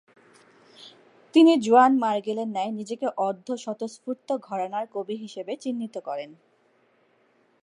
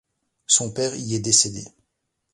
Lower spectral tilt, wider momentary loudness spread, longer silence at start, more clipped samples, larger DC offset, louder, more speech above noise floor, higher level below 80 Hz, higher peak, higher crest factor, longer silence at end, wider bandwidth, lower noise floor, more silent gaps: first, -5 dB/octave vs -2.5 dB/octave; first, 17 LU vs 9 LU; first, 0.8 s vs 0.5 s; neither; neither; second, -25 LUFS vs -20 LUFS; second, 40 dB vs 55 dB; second, -82 dBFS vs -58 dBFS; second, -6 dBFS vs -2 dBFS; about the same, 20 dB vs 22 dB; first, 1.3 s vs 0.65 s; about the same, 11 kHz vs 11.5 kHz; second, -64 dBFS vs -77 dBFS; neither